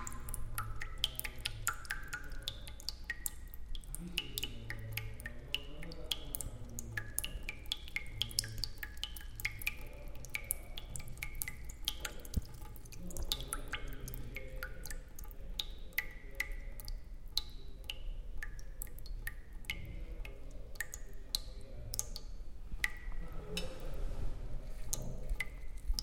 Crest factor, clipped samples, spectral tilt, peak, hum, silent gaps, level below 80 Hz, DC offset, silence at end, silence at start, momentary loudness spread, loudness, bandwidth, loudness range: 30 dB; under 0.1%; -2 dB/octave; -10 dBFS; none; none; -44 dBFS; under 0.1%; 0 s; 0 s; 11 LU; -43 LUFS; 17 kHz; 5 LU